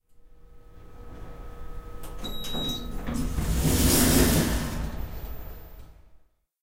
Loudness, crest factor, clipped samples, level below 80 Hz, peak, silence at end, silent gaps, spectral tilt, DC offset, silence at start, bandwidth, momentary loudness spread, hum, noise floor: -25 LUFS; 22 dB; under 0.1%; -34 dBFS; -6 dBFS; 0.45 s; none; -4 dB/octave; under 0.1%; 0.25 s; 16 kHz; 25 LU; none; -56 dBFS